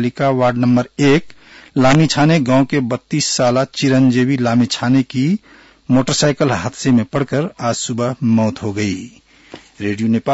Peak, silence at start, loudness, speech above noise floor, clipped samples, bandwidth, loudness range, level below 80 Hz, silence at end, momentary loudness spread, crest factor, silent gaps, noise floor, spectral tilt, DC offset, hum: -4 dBFS; 0 s; -16 LUFS; 25 dB; under 0.1%; 8 kHz; 4 LU; -46 dBFS; 0 s; 7 LU; 12 dB; none; -40 dBFS; -5.5 dB/octave; under 0.1%; none